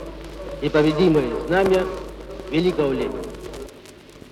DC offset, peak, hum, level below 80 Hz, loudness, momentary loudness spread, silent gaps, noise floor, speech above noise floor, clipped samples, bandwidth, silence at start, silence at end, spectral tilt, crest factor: under 0.1%; -4 dBFS; none; -40 dBFS; -21 LUFS; 18 LU; none; -44 dBFS; 24 dB; under 0.1%; 14.5 kHz; 0 s; 0 s; -6.5 dB/octave; 18 dB